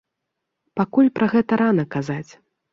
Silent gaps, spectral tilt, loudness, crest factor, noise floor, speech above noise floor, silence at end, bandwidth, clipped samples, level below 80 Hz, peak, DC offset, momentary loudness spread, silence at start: none; -8 dB/octave; -20 LUFS; 16 dB; -80 dBFS; 61 dB; 0.5 s; 7.2 kHz; under 0.1%; -62 dBFS; -6 dBFS; under 0.1%; 12 LU; 0.75 s